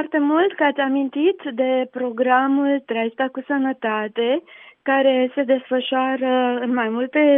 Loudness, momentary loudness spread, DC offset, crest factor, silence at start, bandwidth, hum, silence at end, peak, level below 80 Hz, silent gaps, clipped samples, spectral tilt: -20 LUFS; 6 LU; under 0.1%; 14 dB; 0 s; 3.8 kHz; none; 0 s; -4 dBFS; -82 dBFS; none; under 0.1%; -8.5 dB/octave